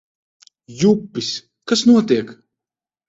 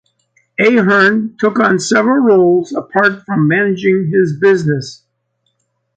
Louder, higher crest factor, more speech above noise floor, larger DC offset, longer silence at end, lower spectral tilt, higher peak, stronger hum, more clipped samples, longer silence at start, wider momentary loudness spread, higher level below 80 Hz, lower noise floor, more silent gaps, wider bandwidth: second, -17 LUFS vs -12 LUFS; about the same, 16 dB vs 12 dB; first, 73 dB vs 54 dB; neither; second, 0.75 s vs 1.05 s; about the same, -5 dB/octave vs -6 dB/octave; about the same, -2 dBFS vs 0 dBFS; neither; neither; about the same, 0.7 s vs 0.6 s; first, 13 LU vs 7 LU; about the same, -58 dBFS vs -60 dBFS; first, -90 dBFS vs -66 dBFS; neither; second, 8 kHz vs 9.2 kHz